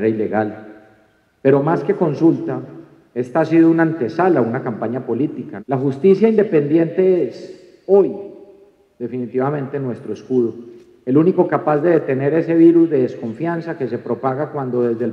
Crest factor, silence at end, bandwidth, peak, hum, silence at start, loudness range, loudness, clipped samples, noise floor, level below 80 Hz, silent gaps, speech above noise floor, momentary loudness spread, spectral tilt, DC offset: 16 dB; 0 s; 6.2 kHz; -2 dBFS; none; 0 s; 5 LU; -17 LUFS; under 0.1%; -56 dBFS; -68 dBFS; none; 40 dB; 15 LU; -9.5 dB/octave; under 0.1%